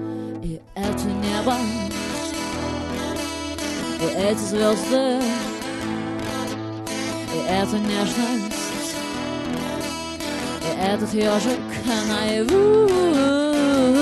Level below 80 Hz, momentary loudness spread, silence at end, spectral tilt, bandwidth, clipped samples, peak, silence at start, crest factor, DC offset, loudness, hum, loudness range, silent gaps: -44 dBFS; 10 LU; 0 s; -4.5 dB/octave; 12.5 kHz; under 0.1%; -6 dBFS; 0 s; 16 dB; under 0.1%; -23 LUFS; none; 5 LU; none